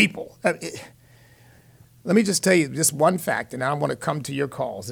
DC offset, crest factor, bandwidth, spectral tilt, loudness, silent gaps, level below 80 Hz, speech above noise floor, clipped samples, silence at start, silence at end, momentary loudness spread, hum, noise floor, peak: under 0.1%; 20 dB; 19 kHz; -4 dB/octave; -23 LUFS; none; -62 dBFS; 30 dB; under 0.1%; 0 s; 0 s; 12 LU; none; -53 dBFS; -4 dBFS